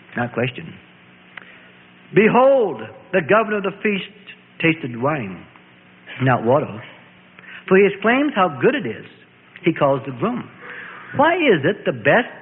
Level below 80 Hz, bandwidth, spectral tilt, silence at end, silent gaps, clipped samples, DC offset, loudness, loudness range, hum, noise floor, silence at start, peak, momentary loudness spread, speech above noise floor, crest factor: -60 dBFS; 4 kHz; -11.5 dB/octave; 0 s; none; under 0.1%; under 0.1%; -18 LUFS; 4 LU; none; -48 dBFS; 0.1 s; -2 dBFS; 20 LU; 30 dB; 18 dB